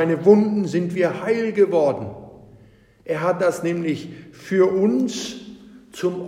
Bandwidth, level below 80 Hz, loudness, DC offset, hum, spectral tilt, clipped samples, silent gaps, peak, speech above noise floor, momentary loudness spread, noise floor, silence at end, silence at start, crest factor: 13.5 kHz; -62 dBFS; -20 LUFS; under 0.1%; none; -6.5 dB/octave; under 0.1%; none; -2 dBFS; 32 dB; 22 LU; -51 dBFS; 0 s; 0 s; 18 dB